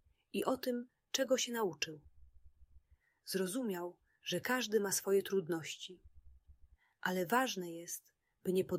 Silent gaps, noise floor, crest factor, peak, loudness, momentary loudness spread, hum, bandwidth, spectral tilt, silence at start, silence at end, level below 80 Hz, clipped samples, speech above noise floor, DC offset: none; -68 dBFS; 20 dB; -18 dBFS; -38 LUFS; 13 LU; none; 16 kHz; -3.5 dB/octave; 0.35 s; 0 s; -70 dBFS; under 0.1%; 31 dB; under 0.1%